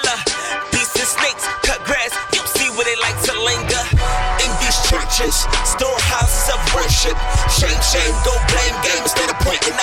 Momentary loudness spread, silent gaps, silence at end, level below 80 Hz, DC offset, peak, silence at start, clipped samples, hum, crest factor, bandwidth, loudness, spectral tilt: 3 LU; none; 0 s; -22 dBFS; under 0.1%; -2 dBFS; 0 s; under 0.1%; none; 16 dB; 17.5 kHz; -16 LUFS; -2 dB/octave